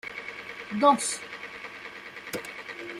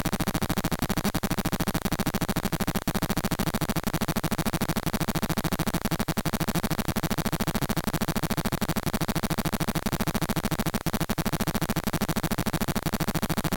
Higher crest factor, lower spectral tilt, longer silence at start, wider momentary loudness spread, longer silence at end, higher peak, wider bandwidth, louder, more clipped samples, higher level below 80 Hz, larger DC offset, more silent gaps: first, 22 dB vs 16 dB; second, -2.5 dB/octave vs -5 dB/octave; about the same, 0.05 s vs 0 s; first, 18 LU vs 1 LU; about the same, 0 s vs 0 s; first, -8 dBFS vs -12 dBFS; second, 16 kHz vs 18 kHz; about the same, -29 LUFS vs -28 LUFS; neither; second, -70 dBFS vs -38 dBFS; neither; neither